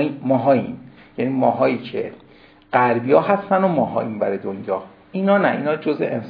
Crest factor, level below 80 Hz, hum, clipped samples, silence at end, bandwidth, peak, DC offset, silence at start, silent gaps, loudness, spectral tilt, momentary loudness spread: 18 dB; -64 dBFS; none; under 0.1%; 0 s; 5 kHz; -2 dBFS; under 0.1%; 0 s; none; -20 LUFS; -10.5 dB/octave; 12 LU